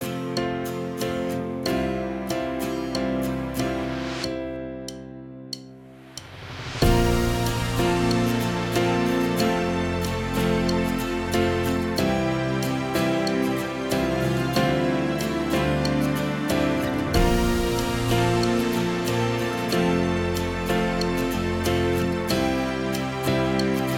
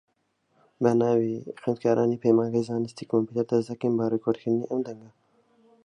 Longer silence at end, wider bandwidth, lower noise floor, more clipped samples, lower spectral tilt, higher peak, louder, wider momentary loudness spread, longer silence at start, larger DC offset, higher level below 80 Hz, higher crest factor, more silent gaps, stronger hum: second, 0 s vs 0.75 s; first, 19.5 kHz vs 10 kHz; second, -44 dBFS vs -72 dBFS; neither; second, -5.5 dB/octave vs -8 dB/octave; about the same, -6 dBFS vs -8 dBFS; about the same, -24 LUFS vs -26 LUFS; about the same, 7 LU vs 9 LU; second, 0 s vs 0.8 s; neither; first, -36 dBFS vs -70 dBFS; about the same, 18 dB vs 18 dB; neither; neither